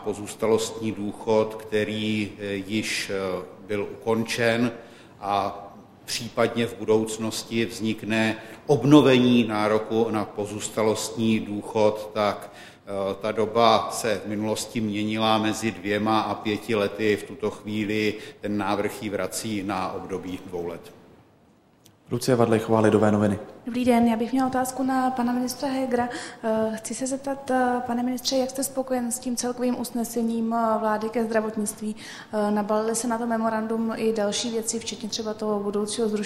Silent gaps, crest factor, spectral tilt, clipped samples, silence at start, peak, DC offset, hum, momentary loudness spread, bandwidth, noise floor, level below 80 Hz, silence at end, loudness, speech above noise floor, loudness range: none; 22 dB; -4.5 dB/octave; under 0.1%; 0 s; -2 dBFS; under 0.1%; none; 10 LU; 16 kHz; -58 dBFS; -60 dBFS; 0 s; -25 LUFS; 33 dB; 6 LU